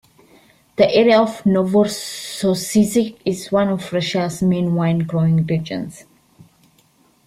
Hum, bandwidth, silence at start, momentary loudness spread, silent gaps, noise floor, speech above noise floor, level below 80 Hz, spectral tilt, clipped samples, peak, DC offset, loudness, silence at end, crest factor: none; 15.5 kHz; 0.8 s; 11 LU; none; -56 dBFS; 39 dB; -54 dBFS; -6 dB/octave; under 0.1%; -2 dBFS; under 0.1%; -18 LUFS; 1.25 s; 16 dB